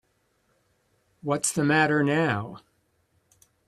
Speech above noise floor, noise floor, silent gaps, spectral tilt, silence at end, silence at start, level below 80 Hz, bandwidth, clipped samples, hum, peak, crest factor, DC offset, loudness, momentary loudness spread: 46 dB; -70 dBFS; none; -4.5 dB/octave; 1.1 s; 1.25 s; -64 dBFS; 14 kHz; under 0.1%; none; -6 dBFS; 22 dB; under 0.1%; -24 LUFS; 13 LU